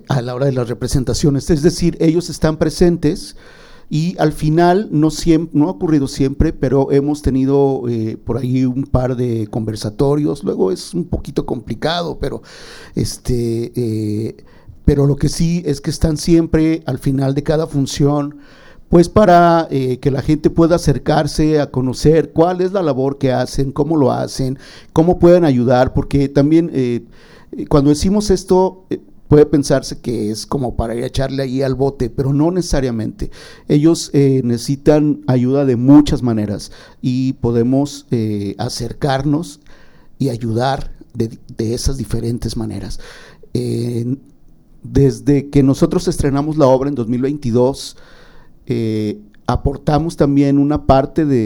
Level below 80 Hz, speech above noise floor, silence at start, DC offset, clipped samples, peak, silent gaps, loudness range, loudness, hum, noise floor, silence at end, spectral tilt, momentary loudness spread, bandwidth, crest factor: -30 dBFS; 28 dB; 0.1 s; under 0.1%; under 0.1%; 0 dBFS; none; 7 LU; -16 LUFS; none; -43 dBFS; 0 s; -7 dB/octave; 10 LU; 17.5 kHz; 16 dB